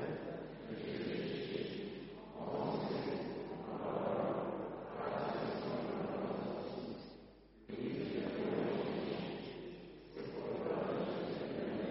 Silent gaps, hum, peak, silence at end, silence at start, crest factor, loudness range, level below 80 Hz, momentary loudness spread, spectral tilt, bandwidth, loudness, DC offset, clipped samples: none; none; -24 dBFS; 0 s; 0 s; 16 dB; 2 LU; -68 dBFS; 11 LU; -5.5 dB/octave; 5.8 kHz; -42 LUFS; under 0.1%; under 0.1%